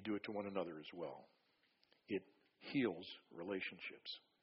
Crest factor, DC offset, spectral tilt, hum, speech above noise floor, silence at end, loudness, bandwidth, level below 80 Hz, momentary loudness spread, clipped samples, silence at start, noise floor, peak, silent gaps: 20 dB; under 0.1%; -3.5 dB/octave; none; 33 dB; 0.25 s; -46 LUFS; 5.6 kHz; -86 dBFS; 11 LU; under 0.1%; 0 s; -79 dBFS; -28 dBFS; none